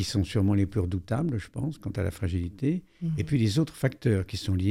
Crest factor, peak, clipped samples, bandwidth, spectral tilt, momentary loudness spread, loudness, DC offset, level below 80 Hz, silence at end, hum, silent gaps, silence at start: 16 dB; -10 dBFS; under 0.1%; 14.5 kHz; -7 dB/octave; 7 LU; -29 LUFS; under 0.1%; -50 dBFS; 0 s; none; none; 0 s